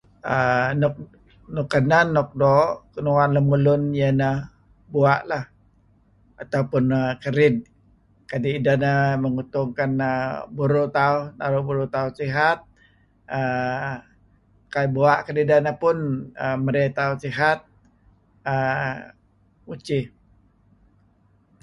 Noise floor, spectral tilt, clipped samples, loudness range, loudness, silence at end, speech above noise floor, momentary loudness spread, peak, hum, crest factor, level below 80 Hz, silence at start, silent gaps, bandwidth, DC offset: -60 dBFS; -8 dB/octave; under 0.1%; 6 LU; -22 LUFS; 1.55 s; 39 dB; 11 LU; -4 dBFS; none; 20 dB; -54 dBFS; 0.25 s; none; 10.5 kHz; under 0.1%